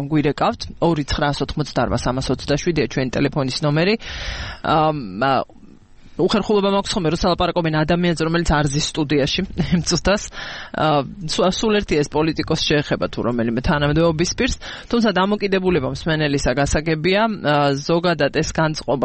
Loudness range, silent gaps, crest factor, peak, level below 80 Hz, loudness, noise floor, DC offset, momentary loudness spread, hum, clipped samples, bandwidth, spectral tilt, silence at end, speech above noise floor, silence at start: 2 LU; none; 14 dB; -4 dBFS; -34 dBFS; -19 LUFS; -43 dBFS; under 0.1%; 5 LU; none; under 0.1%; 8.8 kHz; -5 dB/octave; 0 s; 24 dB; 0 s